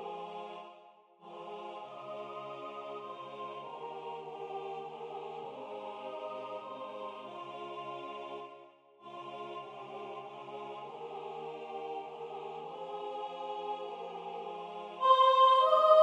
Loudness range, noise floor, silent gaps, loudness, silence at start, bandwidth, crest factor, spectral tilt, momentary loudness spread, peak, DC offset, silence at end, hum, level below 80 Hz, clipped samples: 12 LU; -59 dBFS; none; -35 LUFS; 0 s; 9.6 kHz; 24 dB; -4.5 dB/octave; 19 LU; -12 dBFS; under 0.1%; 0 s; none; under -90 dBFS; under 0.1%